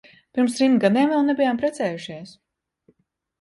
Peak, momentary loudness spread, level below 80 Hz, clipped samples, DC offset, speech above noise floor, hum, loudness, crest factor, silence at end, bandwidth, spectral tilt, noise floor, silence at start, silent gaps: -4 dBFS; 15 LU; -68 dBFS; under 0.1%; under 0.1%; 49 dB; none; -21 LUFS; 18 dB; 1.1 s; 11.5 kHz; -5.5 dB/octave; -70 dBFS; 0.35 s; none